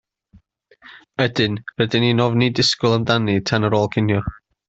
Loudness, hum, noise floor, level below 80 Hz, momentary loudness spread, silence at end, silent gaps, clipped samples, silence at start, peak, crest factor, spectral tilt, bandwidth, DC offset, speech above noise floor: -18 LUFS; none; -54 dBFS; -48 dBFS; 6 LU; 0.35 s; none; under 0.1%; 0.85 s; -2 dBFS; 16 dB; -5.5 dB/octave; 8 kHz; under 0.1%; 36 dB